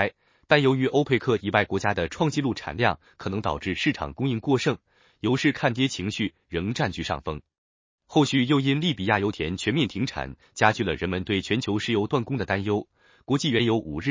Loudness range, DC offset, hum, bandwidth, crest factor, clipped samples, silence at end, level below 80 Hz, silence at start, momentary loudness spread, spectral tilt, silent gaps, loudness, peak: 3 LU; under 0.1%; none; 7.6 kHz; 22 dB; under 0.1%; 0 s; -48 dBFS; 0 s; 8 LU; -5.5 dB/octave; 7.58-7.98 s; -25 LUFS; -2 dBFS